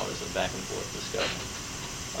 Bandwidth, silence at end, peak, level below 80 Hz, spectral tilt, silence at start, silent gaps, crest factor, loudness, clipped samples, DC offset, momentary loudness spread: 16.5 kHz; 0 s; -14 dBFS; -50 dBFS; -2.5 dB/octave; 0 s; none; 20 dB; -32 LUFS; under 0.1%; under 0.1%; 5 LU